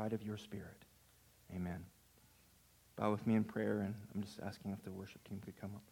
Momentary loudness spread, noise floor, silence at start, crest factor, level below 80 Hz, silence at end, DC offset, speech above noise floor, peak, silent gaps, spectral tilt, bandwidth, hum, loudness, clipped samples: 15 LU; -69 dBFS; 0 s; 22 dB; -74 dBFS; 0.05 s; under 0.1%; 27 dB; -22 dBFS; none; -7.5 dB/octave; 17 kHz; none; -43 LUFS; under 0.1%